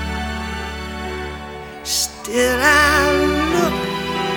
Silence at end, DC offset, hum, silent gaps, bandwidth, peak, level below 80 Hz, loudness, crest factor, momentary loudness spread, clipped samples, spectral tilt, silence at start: 0 s; under 0.1%; none; none; over 20 kHz; 0 dBFS; -32 dBFS; -18 LUFS; 18 dB; 16 LU; under 0.1%; -3.5 dB/octave; 0 s